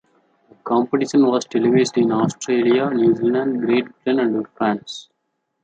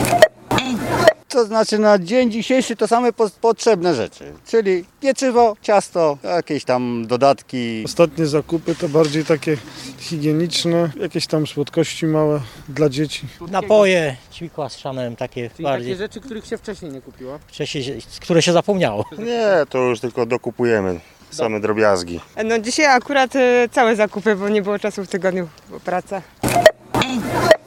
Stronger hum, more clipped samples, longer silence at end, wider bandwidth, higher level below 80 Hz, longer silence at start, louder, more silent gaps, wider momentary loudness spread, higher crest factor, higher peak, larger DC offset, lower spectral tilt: neither; neither; first, 0.6 s vs 0.1 s; second, 9.2 kHz vs 17.5 kHz; second, -66 dBFS vs -50 dBFS; first, 0.65 s vs 0 s; about the same, -19 LUFS vs -18 LUFS; neither; second, 6 LU vs 14 LU; about the same, 14 dB vs 18 dB; second, -4 dBFS vs 0 dBFS; neither; about the same, -6 dB/octave vs -5 dB/octave